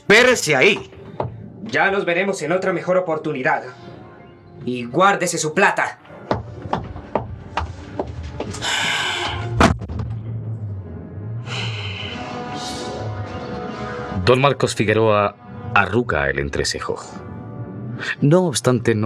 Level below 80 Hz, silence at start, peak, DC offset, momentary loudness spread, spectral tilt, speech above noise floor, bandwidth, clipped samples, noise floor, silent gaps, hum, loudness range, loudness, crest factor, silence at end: -42 dBFS; 0.1 s; 0 dBFS; under 0.1%; 15 LU; -4.5 dB/octave; 25 dB; 15 kHz; under 0.1%; -42 dBFS; none; none; 8 LU; -20 LUFS; 20 dB; 0 s